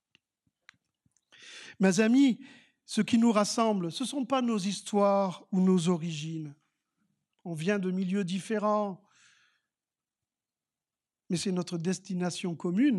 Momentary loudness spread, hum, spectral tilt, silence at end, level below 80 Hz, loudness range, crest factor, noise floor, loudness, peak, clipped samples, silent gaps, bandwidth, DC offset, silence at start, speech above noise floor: 14 LU; none; -5.5 dB/octave; 0 s; -82 dBFS; 9 LU; 18 dB; under -90 dBFS; -29 LUFS; -12 dBFS; under 0.1%; none; 12 kHz; under 0.1%; 1.4 s; over 62 dB